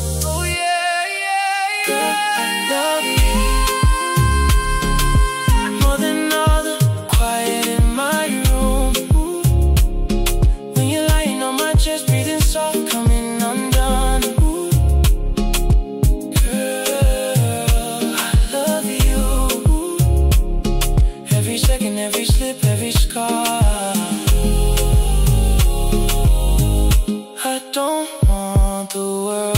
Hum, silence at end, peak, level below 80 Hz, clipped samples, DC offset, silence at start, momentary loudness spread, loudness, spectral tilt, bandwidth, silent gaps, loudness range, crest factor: none; 0 s; -4 dBFS; -18 dBFS; under 0.1%; under 0.1%; 0 s; 4 LU; -18 LUFS; -4.5 dB/octave; 16.5 kHz; none; 1 LU; 12 dB